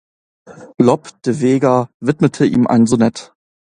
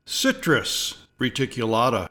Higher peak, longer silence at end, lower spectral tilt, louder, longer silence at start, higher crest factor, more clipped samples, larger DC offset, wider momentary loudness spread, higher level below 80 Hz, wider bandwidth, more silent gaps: first, 0 dBFS vs -6 dBFS; first, 0.55 s vs 0.05 s; first, -7 dB/octave vs -3.5 dB/octave; first, -15 LUFS vs -23 LUFS; first, 0.5 s vs 0.05 s; about the same, 16 dB vs 18 dB; neither; neither; about the same, 7 LU vs 6 LU; about the same, -54 dBFS vs -52 dBFS; second, 10.5 kHz vs 19 kHz; first, 1.94-2.00 s vs none